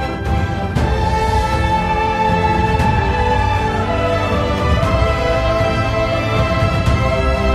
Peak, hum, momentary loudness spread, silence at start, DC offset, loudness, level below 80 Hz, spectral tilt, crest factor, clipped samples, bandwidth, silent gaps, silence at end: -2 dBFS; none; 2 LU; 0 s; under 0.1%; -16 LUFS; -22 dBFS; -6.5 dB/octave; 14 dB; under 0.1%; 13 kHz; none; 0 s